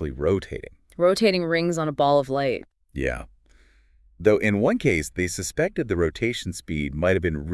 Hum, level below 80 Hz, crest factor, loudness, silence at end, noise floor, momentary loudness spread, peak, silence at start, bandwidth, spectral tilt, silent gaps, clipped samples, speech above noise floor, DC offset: none; -44 dBFS; 20 dB; -23 LUFS; 0 s; -57 dBFS; 10 LU; -4 dBFS; 0 s; 12 kHz; -5.5 dB/octave; none; under 0.1%; 34 dB; under 0.1%